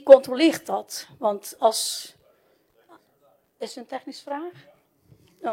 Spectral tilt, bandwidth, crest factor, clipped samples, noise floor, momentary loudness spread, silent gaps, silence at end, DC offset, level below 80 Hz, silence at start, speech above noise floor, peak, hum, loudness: -2.5 dB/octave; 16.5 kHz; 24 dB; under 0.1%; -63 dBFS; 18 LU; none; 0 s; under 0.1%; -72 dBFS; 0.05 s; 40 dB; 0 dBFS; none; -23 LUFS